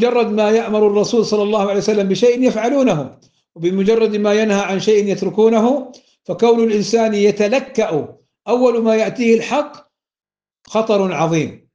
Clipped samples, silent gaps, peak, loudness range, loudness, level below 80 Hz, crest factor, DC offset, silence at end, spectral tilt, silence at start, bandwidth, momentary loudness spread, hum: under 0.1%; none; -2 dBFS; 2 LU; -16 LUFS; -60 dBFS; 14 dB; under 0.1%; 0.2 s; -5.5 dB/octave; 0 s; 7.8 kHz; 8 LU; none